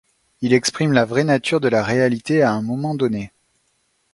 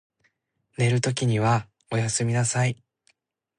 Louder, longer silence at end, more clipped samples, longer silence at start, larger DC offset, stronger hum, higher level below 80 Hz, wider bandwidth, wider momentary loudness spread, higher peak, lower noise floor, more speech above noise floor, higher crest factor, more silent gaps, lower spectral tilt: first, -19 LUFS vs -24 LUFS; about the same, 0.85 s vs 0.85 s; neither; second, 0.4 s vs 0.8 s; neither; neither; about the same, -56 dBFS vs -60 dBFS; about the same, 11.5 kHz vs 11 kHz; about the same, 6 LU vs 7 LU; first, 0 dBFS vs -10 dBFS; second, -66 dBFS vs -71 dBFS; about the same, 48 dB vs 48 dB; about the same, 20 dB vs 16 dB; neither; about the same, -5.5 dB/octave vs -5 dB/octave